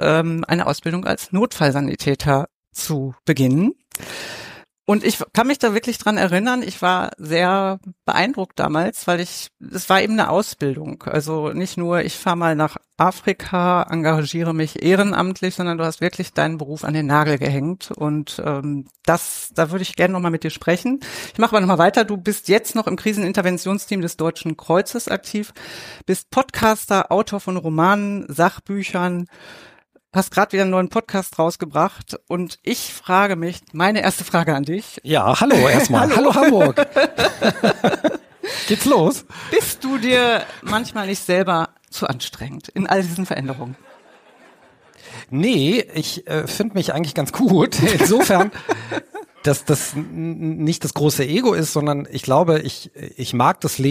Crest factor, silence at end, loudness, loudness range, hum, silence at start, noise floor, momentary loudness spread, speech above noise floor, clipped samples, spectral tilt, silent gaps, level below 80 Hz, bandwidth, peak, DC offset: 18 dB; 0 s; -19 LUFS; 5 LU; none; 0 s; -51 dBFS; 11 LU; 32 dB; under 0.1%; -5 dB/octave; 2.54-2.71 s; -52 dBFS; 15.5 kHz; -2 dBFS; under 0.1%